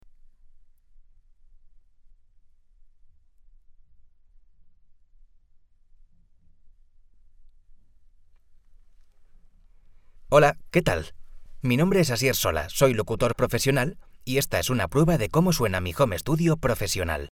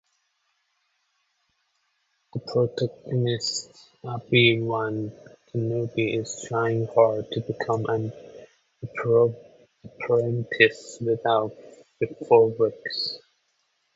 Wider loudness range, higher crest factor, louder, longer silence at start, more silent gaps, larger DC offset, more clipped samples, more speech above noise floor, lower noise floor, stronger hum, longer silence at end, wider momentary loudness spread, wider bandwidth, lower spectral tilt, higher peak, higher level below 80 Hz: about the same, 4 LU vs 6 LU; about the same, 22 dB vs 24 dB; about the same, -24 LUFS vs -24 LUFS; first, 3.7 s vs 2.35 s; neither; neither; neither; second, 33 dB vs 49 dB; second, -56 dBFS vs -73 dBFS; neither; second, 0.05 s vs 0.8 s; second, 6 LU vs 16 LU; first, 19 kHz vs 8 kHz; about the same, -5 dB/octave vs -5.5 dB/octave; second, -6 dBFS vs -2 dBFS; first, -44 dBFS vs -64 dBFS